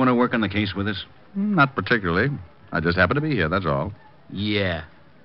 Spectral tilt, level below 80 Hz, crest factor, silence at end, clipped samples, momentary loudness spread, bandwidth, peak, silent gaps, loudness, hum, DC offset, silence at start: -4.5 dB/octave; -46 dBFS; 20 dB; 0.35 s; under 0.1%; 13 LU; 5.8 kHz; -4 dBFS; none; -23 LUFS; none; 0.3%; 0 s